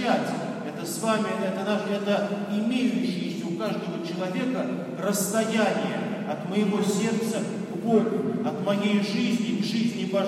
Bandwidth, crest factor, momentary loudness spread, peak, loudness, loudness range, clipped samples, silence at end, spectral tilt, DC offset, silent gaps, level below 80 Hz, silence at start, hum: 15.5 kHz; 16 dB; 7 LU; -8 dBFS; -26 LUFS; 2 LU; under 0.1%; 0 s; -5 dB/octave; under 0.1%; none; -76 dBFS; 0 s; none